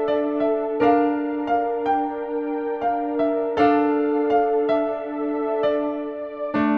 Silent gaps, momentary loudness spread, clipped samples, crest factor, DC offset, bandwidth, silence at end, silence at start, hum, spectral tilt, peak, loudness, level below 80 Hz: none; 8 LU; under 0.1%; 16 dB; under 0.1%; 5.4 kHz; 0 s; 0 s; none; -7.5 dB/octave; -6 dBFS; -22 LUFS; -58 dBFS